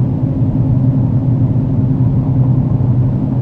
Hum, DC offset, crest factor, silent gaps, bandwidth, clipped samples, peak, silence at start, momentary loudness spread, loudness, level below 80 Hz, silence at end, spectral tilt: none; under 0.1%; 12 dB; none; 2.5 kHz; under 0.1%; -2 dBFS; 0 s; 2 LU; -14 LUFS; -30 dBFS; 0 s; -12.5 dB/octave